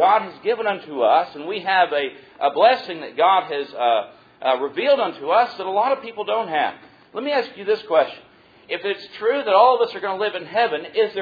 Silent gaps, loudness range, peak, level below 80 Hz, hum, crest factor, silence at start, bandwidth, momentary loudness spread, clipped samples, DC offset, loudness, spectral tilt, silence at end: none; 4 LU; -2 dBFS; -72 dBFS; none; 18 dB; 0 s; 5 kHz; 10 LU; under 0.1%; under 0.1%; -21 LUFS; -5.5 dB/octave; 0 s